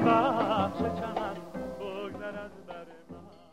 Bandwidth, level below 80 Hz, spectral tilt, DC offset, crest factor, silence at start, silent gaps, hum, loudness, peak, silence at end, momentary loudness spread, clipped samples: 15.5 kHz; -58 dBFS; -7 dB/octave; 0.2%; 20 dB; 0 s; none; none; -31 LUFS; -10 dBFS; 0.1 s; 22 LU; under 0.1%